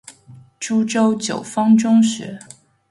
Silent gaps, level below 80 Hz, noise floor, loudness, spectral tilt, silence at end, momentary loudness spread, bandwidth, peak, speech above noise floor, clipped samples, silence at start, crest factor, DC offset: none; -64 dBFS; -45 dBFS; -17 LUFS; -5 dB/octave; 0.55 s; 17 LU; 11.5 kHz; -4 dBFS; 28 dB; under 0.1%; 0.1 s; 14 dB; under 0.1%